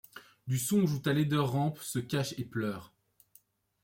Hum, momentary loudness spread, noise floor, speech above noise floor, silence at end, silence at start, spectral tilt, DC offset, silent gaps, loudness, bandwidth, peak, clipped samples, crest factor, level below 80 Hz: none; 11 LU; -66 dBFS; 35 dB; 1 s; 0.15 s; -5.5 dB/octave; under 0.1%; none; -32 LUFS; 16.5 kHz; -16 dBFS; under 0.1%; 16 dB; -68 dBFS